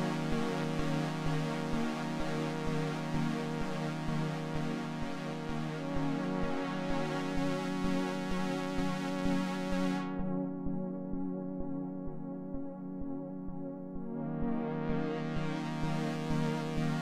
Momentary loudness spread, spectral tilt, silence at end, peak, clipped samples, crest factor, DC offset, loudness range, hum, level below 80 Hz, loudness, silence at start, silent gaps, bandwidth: 7 LU; -6.5 dB/octave; 0 s; -20 dBFS; under 0.1%; 14 dB; under 0.1%; 5 LU; none; -50 dBFS; -36 LUFS; 0 s; none; 14 kHz